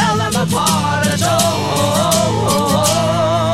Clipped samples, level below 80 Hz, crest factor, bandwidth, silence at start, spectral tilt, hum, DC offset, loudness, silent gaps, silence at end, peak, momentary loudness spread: under 0.1%; -40 dBFS; 12 dB; 16.5 kHz; 0 s; -4 dB/octave; none; 0.7%; -14 LUFS; none; 0 s; -2 dBFS; 2 LU